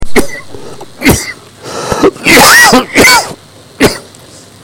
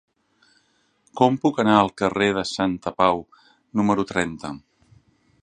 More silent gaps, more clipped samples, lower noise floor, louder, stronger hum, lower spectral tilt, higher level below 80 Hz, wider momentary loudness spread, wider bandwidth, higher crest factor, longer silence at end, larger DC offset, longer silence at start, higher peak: neither; first, 1% vs under 0.1%; second, -34 dBFS vs -65 dBFS; first, -6 LUFS vs -21 LUFS; neither; second, -2.5 dB/octave vs -5.5 dB/octave; first, -28 dBFS vs -54 dBFS; first, 22 LU vs 14 LU; first, over 20 kHz vs 9.8 kHz; second, 8 dB vs 22 dB; second, 0.6 s vs 0.85 s; neither; second, 0 s vs 1.15 s; about the same, 0 dBFS vs -2 dBFS